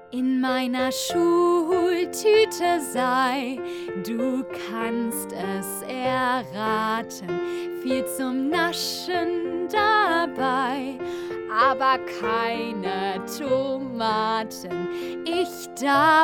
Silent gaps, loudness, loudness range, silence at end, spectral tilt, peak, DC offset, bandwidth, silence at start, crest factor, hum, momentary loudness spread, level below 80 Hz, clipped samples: none; -24 LUFS; 5 LU; 0 s; -3.5 dB/octave; -8 dBFS; under 0.1%; 19.5 kHz; 0 s; 16 dB; none; 10 LU; -62 dBFS; under 0.1%